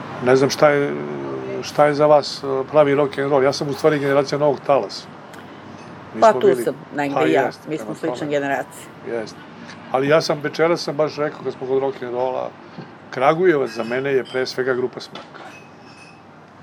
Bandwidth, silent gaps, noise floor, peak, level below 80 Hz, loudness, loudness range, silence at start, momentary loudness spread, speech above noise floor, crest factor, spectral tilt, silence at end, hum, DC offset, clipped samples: 15.5 kHz; none; -44 dBFS; 0 dBFS; -70 dBFS; -19 LUFS; 5 LU; 0 s; 22 LU; 25 dB; 18 dB; -5.5 dB/octave; 0 s; none; under 0.1%; under 0.1%